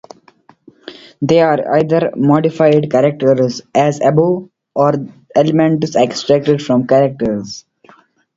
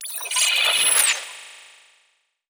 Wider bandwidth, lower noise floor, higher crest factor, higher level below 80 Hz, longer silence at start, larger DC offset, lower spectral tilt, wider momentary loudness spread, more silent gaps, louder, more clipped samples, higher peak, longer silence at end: second, 7.8 kHz vs over 20 kHz; second, -49 dBFS vs -66 dBFS; second, 14 dB vs 20 dB; first, -52 dBFS vs under -90 dBFS; first, 0.85 s vs 0 s; neither; first, -7 dB/octave vs 5 dB/octave; second, 10 LU vs 17 LU; neither; first, -14 LUFS vs -17 LUFS; neither; about the same, 0 dBFS vs -2 dBFS; second, 0.75 s vs 0.9 s